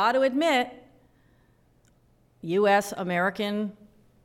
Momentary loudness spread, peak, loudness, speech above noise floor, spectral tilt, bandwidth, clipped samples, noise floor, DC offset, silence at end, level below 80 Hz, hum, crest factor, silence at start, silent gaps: 12 LU; -10 dBFS; -25 LUFS; 38 dB; -5 dB/octave; 17 kHz; under 0.1%; -62 dBFS; under 0.1%; 0.5 s; -68 dBFS; none; 16 dB; 0 s; none